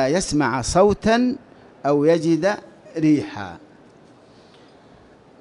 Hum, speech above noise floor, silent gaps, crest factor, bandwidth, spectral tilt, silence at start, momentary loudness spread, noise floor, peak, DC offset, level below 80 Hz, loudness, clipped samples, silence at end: none; 30 dB; none; 18 dB; 11.5 kHz; -5.5 dB/octave; 0 s; 16 LU; -49 dBFS; -4 dBFS; under 0.1%; -44 dBFS; -20 LUFS; under 0.1%; 1.85 s